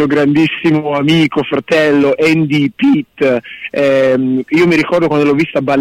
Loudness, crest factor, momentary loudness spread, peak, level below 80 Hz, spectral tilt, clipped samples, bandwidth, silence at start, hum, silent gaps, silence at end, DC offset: -12 LUFS; 8 dB; 4 LU; -2 dBFS; -50 dBFS; -6.5 dB/octave; under 0.1%; 12.5 kHz; 0 s; none; none; 0 s; under 0.1%